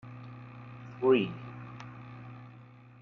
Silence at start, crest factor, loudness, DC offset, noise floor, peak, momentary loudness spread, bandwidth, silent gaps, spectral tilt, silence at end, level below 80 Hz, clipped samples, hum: 0.05 s; 22 dB; -29 LUFS; under 0.1%; -53 dBFS; -14 dBFS; 24 LU; 6.2 kHz; none; -8.5 dB/octave; 0.5 s; -70 dBFS; under 0.1%; none